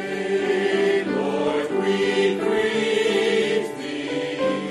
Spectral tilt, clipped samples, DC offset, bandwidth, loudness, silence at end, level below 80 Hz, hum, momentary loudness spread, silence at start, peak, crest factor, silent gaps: -4.5 dB/octave; under 0.1%; under 0.1%; 12 kHz; -22 LUFS; 0 s; -62 dBFS; none; 6 LU; 0 s; -10 dBFS; 12 dB; none